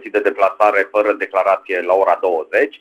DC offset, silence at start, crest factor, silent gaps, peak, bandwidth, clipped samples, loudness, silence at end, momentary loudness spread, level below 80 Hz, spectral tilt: under 0.1%; 0 s; 16 dB; none; -2 dBFS; 13.5 kHz; under 0.1%; -16 LUFS; 0.05 s; 4 LU; -60 dBFS; -4.5 dB/octave